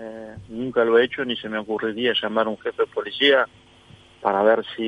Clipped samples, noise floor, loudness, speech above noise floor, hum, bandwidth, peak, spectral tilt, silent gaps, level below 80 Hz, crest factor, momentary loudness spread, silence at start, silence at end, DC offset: under 0.1%; -50 dBFS; -22 LUFS; 29 dB; none; 8.4 kHz; -4 dBFS; -5.5 dB/octave; none; -60 dBFS; 18 dB; 11 LU; 0 s; 0 s; under 0.1%